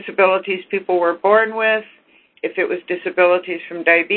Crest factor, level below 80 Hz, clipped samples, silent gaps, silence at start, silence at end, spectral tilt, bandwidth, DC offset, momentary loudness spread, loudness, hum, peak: 18 dB; -66 dBFS; under 0.1%; none; 0 s; 0 s; -9.5 dB/octave; 4.4 kHz; under 0.1%; 8 LU; -17 LUFS; none; 0 dBFS